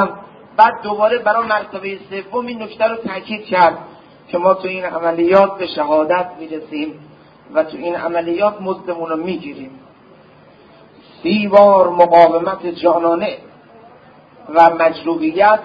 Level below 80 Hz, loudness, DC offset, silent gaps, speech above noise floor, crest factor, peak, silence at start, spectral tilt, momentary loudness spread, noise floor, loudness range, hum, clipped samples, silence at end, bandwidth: -58 dBFS; -15 LUFS; under 0.1%; none; 30 dB; 16 dB; 0 dBFS; 0 s; -7.5 dB/octave; 15 LU; -45 dBFS; 8 LU; none; under 0.1%; 0 s; 5.2 kHz